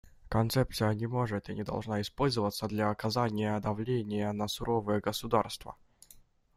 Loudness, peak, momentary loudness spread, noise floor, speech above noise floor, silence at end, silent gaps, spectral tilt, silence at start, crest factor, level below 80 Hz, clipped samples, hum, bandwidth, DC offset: -32 LUFS; -12 dBFS; 6 LU; -59 dBFS; 28 dB; 0.8 s; none; -6 dB/octave; 0.25 s; 22 dB; -54 dBFS; under 0.1%; none; 16 kHz; under 0.1%